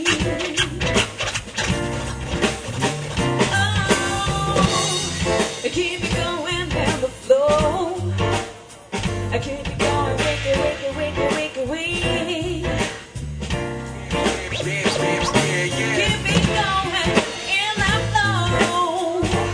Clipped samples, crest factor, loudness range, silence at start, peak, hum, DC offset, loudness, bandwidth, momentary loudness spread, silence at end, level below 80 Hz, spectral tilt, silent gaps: under 0.1%; 20 dB; 4 LU; 0 s; -2 dBFS; none; under 0.1%; -21 LUFS; 10.5 kHz; 7 LU; 0 s; -36 dBFS; -4 dB/octave; none